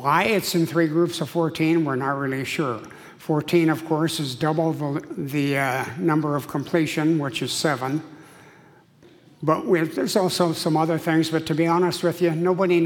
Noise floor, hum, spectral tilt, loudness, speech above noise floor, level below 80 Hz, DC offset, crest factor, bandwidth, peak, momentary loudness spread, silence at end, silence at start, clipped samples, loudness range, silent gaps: -52 dBFS; none; -5.5 dB/octave; -23 LUFS; 30 dB; -64 dBFS; under 0.1%; 18 dB; 18 kHz; -6 dBFS; 6 LU; 0 s; 0 s; under 0.1%; 3 LU; none